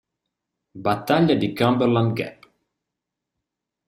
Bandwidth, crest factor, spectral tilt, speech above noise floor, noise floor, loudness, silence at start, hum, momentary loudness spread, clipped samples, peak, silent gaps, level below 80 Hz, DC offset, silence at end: 15.5 kHz; 20 dB; -7.5 dB/octave; 64 dB; -84 dBFS; -21 LUFS; 0.75 s; none; 10 LU; under 0.1%; -4 dBFS; none; -60 dBFS; under 0.1%; 1.55 s